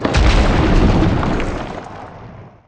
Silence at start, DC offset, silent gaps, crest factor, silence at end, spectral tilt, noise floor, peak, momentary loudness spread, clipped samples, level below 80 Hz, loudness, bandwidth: 0 s; under 0.1%; none; 14 dB; 0.2 s; -6.5 dB/octave; -37 dBFS; 0 dBFS; 19 LU; under 0.1%; -18 dBFS; -16 LUFS; 9.2 kHz